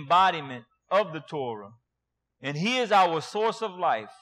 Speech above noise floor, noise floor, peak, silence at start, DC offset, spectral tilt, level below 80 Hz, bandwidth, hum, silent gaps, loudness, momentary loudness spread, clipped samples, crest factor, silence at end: 57 dB; -83 dBFS; -10 dBFS; 0 s; under 0.1%; -4.5 dB/octave; -70 dBFS; 12.5 kHz; none; none; -26 LUFS; 15 LU; under 0.1%; 18 dB; 0.1 s